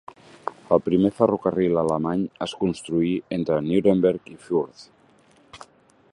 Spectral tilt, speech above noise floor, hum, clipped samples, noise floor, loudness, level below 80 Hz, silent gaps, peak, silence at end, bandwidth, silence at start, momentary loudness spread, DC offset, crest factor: -7.5 dB/octave; 35 dB; none; under 0.1%; -57 dBFS; -23 LUFS; -54 dBFS; none; -4 dBFS; 0.55 s; 11 kHz; 0.45 s; 11 LU; under 0.1%; 20 dB